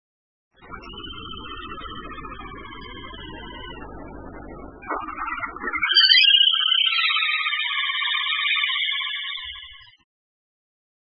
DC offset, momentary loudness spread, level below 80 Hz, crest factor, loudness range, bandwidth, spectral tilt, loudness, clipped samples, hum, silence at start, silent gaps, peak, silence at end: under 0.1%; 25 LU; -48 dBFS; 22 dB; 20 LU; 5.8 kHz; -5.5 dB/octave; -18 LUFS; under 0.1%; none; 0.6 s; none; -2 dBFS; 1.35 s